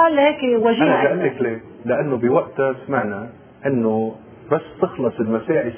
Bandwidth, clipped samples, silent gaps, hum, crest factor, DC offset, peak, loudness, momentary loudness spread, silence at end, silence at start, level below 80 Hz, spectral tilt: 3.5 kHz; under 0.1%; none; none; 16 dB; under 0.1%; -2 dBFS; -20 LUFS; 11 LU; 0 s; 0 s; -58 dBFS; -10.5 dB/octave